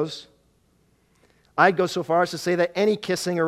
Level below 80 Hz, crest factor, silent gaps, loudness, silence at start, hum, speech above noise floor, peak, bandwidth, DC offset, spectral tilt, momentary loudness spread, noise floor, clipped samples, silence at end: -66 dBFS; 22 dB; none; -22 LUFS; 0 s; none; 41 dB; -2 dBFS; 15.5 kHz; under 0.1%; -5 dB/octave; 12 LU; -63 dBFS; under 0.1%; 0 s